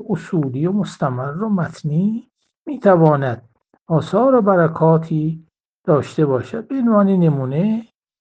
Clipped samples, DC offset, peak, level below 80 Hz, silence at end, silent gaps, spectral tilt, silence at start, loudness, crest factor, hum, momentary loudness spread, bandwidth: under 0.1%; under 0.1%; 0 dBFS; -58 dBFS; 0.4 s; 2.58-2.65 s, 3.81-3.86 s, 5.60-5.84 s; -9 dB/octave; 0 s; -17 LUFS; 18 dB; none; 11 LU; 8.6 kHz